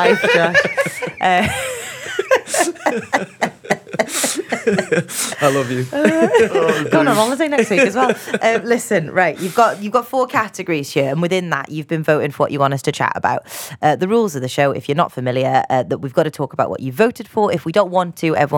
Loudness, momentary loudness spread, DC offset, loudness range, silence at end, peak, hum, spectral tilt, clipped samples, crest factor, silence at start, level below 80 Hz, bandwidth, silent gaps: -17 LUFS; 8 LU; under 0.1%; 4 LU; 0 s; 0 dBFS; none; -4.5 dB/octave; under 0.1%; 16 dB; 0 s; -56 dBFS; 19.5 kHz; none